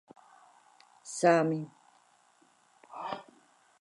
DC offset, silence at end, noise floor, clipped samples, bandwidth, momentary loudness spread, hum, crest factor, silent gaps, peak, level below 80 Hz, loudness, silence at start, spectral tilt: under 0.1%; 0.6 s; -66 dBFS; under 0.1%; 11.5 kHz; 23 LU; none; 24 dB; none; -12 dBFS; -86 dBFS; -30 LUFS; 1.05 s; -5.5 dB/octave